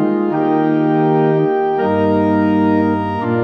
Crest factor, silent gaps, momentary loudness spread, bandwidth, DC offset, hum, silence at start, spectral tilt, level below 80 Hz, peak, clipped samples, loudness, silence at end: 12 dB; none; 2 LU; 5.8 kHz; under 0.1%; none; 0 s; -10 dB/octave; -58 dBFS; -4 dBFS; under 0.1%; -15 LUFS; 0 s